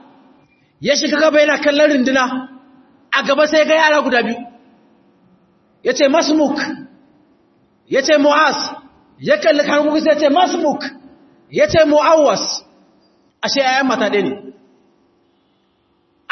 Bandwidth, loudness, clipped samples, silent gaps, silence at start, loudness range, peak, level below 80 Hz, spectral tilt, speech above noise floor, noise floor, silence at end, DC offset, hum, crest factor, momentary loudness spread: 6.4 kHz; -14 LUFS; under 0.1%; none; 0.8 s; 5 LU; 0 dBFS; -56 dBFS; -3.5 dB/octave; 46 dB; -60 dBFS; 1.8 s; under 0.1%; none; 16 dB; 13 LU